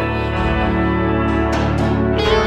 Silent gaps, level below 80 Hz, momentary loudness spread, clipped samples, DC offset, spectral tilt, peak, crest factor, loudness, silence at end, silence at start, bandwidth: none; -24 dBFS; 2 LU; under 0.1%; under 0.1%; -7 dB/octave; -2 dBFS; 14 dB; -17 LUFS; 0 s; 0 s; 9.6 kHz